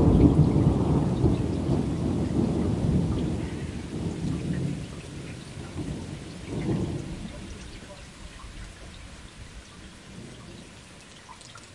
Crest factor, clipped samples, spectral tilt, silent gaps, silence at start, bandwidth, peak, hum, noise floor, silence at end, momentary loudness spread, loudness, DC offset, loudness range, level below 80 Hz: 24 dB; under 0.1%; -8 dB/octave; none; 0 s; 11.5 kHz; -4 dBFS; none; -47 dBFS; 0 s; 22 LU; -27 LUFS; under 0.1%; 19 LU; -38 dBFS